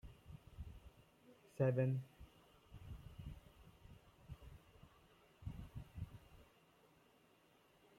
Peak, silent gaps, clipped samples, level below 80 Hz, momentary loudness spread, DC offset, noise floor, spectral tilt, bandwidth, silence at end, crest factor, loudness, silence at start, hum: -26 dBFS; none; under 0.1%; -64 dBFS; 27 LU; under 0.1%; -72 dBFS; -8.5 dB/octave; 14 kHz; 1.55 s; 24 dB; -45 LUFS; 0.05 s; none